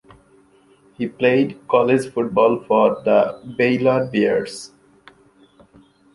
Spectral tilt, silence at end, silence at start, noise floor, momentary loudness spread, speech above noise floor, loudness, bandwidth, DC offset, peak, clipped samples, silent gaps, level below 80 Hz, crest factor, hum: -6.5 dB/octave; 1.5 s; 1 s; -54 dBFS; 12 LU; 36 dB; -18 LUFS; 11.5 kHz; under 0.1%; -2 dBFS; under 0.1%; none; -60 dBFS; 18 dB; none